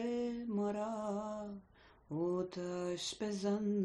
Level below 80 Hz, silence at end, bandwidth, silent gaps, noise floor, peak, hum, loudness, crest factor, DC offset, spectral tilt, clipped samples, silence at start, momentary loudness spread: -70 dBFS; 0 s; 10 kHz; none; -64 dBFS; -26 dBFS; none; -39 LUFS; 14 dB; under 0.1%; -5.5 dB/octave; under 0.1%; 0 s; 8 LU